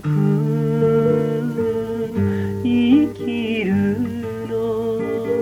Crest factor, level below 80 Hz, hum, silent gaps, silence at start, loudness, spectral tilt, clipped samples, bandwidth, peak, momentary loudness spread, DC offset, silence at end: 14 dB; -50 dBFS; none; none; 0 s; -20 LUFS; -8.5 dB/octave; under 0.1%; 15.5 kHz; -4 dBFS; 8 LU; under 0.1%; 0 s